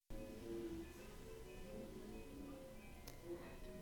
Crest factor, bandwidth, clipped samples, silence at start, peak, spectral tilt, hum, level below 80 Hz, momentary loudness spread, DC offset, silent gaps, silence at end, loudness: 20 dB; 19 kHz; under 0.1%; 0.1 s; -32 dBFS; -5.5 dB/octave; none; -60 dBFS; 7 LU; under 0.1%; none; 0 s; -54 LUFS